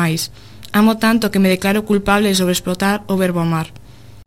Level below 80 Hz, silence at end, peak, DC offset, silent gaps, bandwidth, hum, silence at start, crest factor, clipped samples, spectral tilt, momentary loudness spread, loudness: -42 dBFS; 0.5 s; 0 dBFS; 0.8%; none; 16.5 kHz; none; 0 s; 16 dB; under 0.1%; -5 dB/octave; 8 LU; -16 LUFS